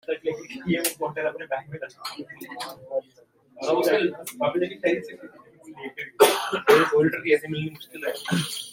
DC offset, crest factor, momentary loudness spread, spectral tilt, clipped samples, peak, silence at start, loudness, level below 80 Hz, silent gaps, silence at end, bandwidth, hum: under 0.1%; 22 dB; 17 LU; -4 dB/octave; under 0.1%; -2 dBFS; 0.1 s; -24 LUFS; -68 dBFS; none; 0 s; 16.5 kHz; none